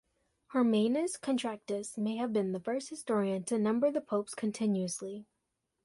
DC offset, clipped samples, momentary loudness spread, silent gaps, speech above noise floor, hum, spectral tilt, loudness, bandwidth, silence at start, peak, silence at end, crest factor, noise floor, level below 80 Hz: under 0.1%; under 0.1%; 8 LU; none; 51 dB; none; -5.5 dB/octave; -33 LUFS; 11.5 kHz; 0.5 s; -18 dBFS; 0.6 s; 14 dB; -83 dBFS; -76 dBFS